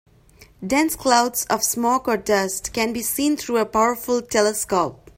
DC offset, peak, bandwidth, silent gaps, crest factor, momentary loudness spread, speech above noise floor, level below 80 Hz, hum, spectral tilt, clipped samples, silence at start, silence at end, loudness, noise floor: under 0.1%; -2 dBFS; 16.5 kHz; none; 18 dB; 5 LU; 30 dB; -50 dBFS; none; -2.5 dB/octave; under 0.1%; 0.4 s; 0.25 s; -20 LUFS; -51 dBFS